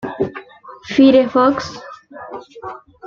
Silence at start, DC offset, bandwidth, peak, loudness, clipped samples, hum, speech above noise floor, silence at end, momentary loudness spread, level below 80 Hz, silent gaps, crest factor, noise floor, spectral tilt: 0.05 s; under 0.1%; 7.2 kHz; 0 dBFS; -15 LUFS; under 0.1%; none; 24 dB; 0 s; 24 LU; -56 dBFS; none; 16 dB; -37 dBFS; -6 dB/octave